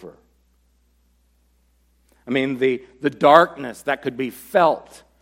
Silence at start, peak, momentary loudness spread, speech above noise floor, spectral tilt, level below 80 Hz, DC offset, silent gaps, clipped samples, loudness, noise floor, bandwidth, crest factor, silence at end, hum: 0.05 s; 0 dBFS; 14 LU; 42 dB; -5.5 dB/octave; -62 dBFS; under 0.1%; none; under 0.1%; -19 LUFS; -61 dBFS; 16.5 kHz; 22 dB; 0.45 s; none